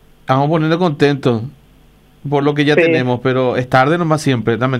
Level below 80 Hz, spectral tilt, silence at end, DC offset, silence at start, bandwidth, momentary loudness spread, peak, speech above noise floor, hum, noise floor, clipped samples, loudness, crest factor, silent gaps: -50 dBFS; -7 dB/octave; 0 s; under 0.1%; 0.3 s; 13.5 kHz; 6 LU; 0 dBFS; 33 dB; none; -47 dBFS; under 0.1%; -15 LUFS; 14 dB; none